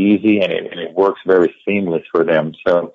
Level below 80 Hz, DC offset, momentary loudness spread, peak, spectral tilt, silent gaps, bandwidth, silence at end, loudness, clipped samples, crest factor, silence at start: -60 dBFS; under 0.1%; 6 LU; -2 dBFS; -8 dB/octave; none; 6.8 kHz; 0.05 s; -16 LUFS; under 0.1%; 12 dB; 0 s